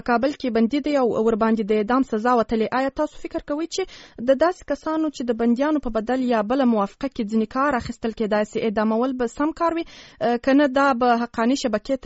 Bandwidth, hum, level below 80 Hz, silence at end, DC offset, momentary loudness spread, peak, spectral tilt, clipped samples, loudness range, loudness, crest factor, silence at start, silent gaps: 8 kHz; none; -48 dBFS; 0.1 s; under 0.1%; 8 LU; -6 dBFS; -4 dB/octave; under 0.1%; 2 LU; -22 LUFS; 16 dB; 0.05 s; none